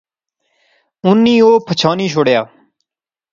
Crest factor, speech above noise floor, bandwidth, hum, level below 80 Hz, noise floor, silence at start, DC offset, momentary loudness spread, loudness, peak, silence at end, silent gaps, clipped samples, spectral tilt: 14 dB; 74 dB; 7.6 kHz; none; -60 dBFS; -86 dBFS; 1.05 s; under 0.1%; 8 LU; -12 LUFS; 0 dBFS; 0.9 s; none; under 0.1%; -6 dB/octave